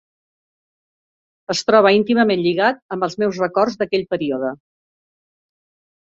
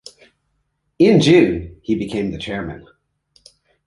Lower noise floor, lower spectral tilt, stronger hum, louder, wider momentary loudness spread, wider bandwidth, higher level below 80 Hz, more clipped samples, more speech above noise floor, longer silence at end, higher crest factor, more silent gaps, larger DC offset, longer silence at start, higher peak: first, under -90 dBFS vs -69 dBFS; second, -5 dB/octave vs -6.5 dB/octave; neither; about the same, -18 LUFS vs -17 LUFS; second, 11 LU vs 16 LU; second, 7.8 kHz vs 11.5 kHz; second, -62 dBFS vs -44 dBFS; neither; first, over 73 dB vs 54 dB; first, 1.5 s vs 1.05 s; about the same, 18 dB vs 18 dB; first, 2.82-2.89 s vs none; neither; first, 1.5 s vs 1 s; about the same, -2 dBFS vs 0 dBFS